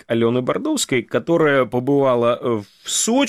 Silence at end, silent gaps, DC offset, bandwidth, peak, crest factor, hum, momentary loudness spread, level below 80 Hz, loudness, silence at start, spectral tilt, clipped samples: 0 s; none; under 0.1%; 16 kHz; -8 dBFS; 12 dB; none; 6 LU; -58 dBFS; -19 LUFS; 0.1 s; -4 dB/octave; under 0.1%